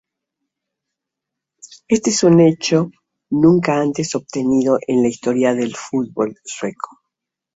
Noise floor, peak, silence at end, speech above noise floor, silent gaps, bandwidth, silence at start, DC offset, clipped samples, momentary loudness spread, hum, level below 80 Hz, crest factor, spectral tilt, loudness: -82 dBFS; -2 dBFS; 0.7 s; 66 dB; none; 8 kHz; 1.65 s; under 0.1%; under 0.1%; 14 LU; none; -58 dBFS; 18 dB; -5.5 dB/octave; -17 LUFS